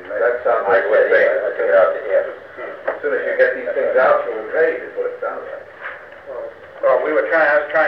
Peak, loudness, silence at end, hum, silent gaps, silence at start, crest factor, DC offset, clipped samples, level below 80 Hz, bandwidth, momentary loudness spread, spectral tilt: -2 dBFS; -17 LUFS; 0 s; none; none; 0 s; 16 dB; 0.1%; under 0.1%; -64 dBFS; 5.6 kHz; 17 LU; -6 dB/octave